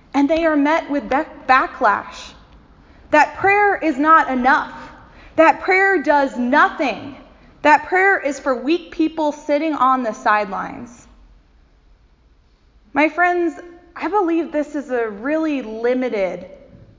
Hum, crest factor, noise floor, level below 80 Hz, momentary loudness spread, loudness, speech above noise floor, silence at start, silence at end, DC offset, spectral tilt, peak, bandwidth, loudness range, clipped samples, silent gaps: none; 18 dB; -54 dBFS; -50 dBFS; 12 LU; -17 LUFS; 36 dB; 0.15 s; 0.45 s; under 0.1%; -4.5 dB/octave; 0 dBFS; 7.6 kHz; 7 LU; under 0.1%; none